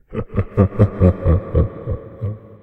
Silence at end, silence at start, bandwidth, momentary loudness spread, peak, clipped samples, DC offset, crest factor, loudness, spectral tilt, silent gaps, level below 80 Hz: 0.05 s; 0.1 s; 3.7 kHz; 14 LU; 0 dBFS; under 0.1%; under 0.1%; 18 dB; -19 LUFS; -11.5 dB/octave; none; -28 dBFS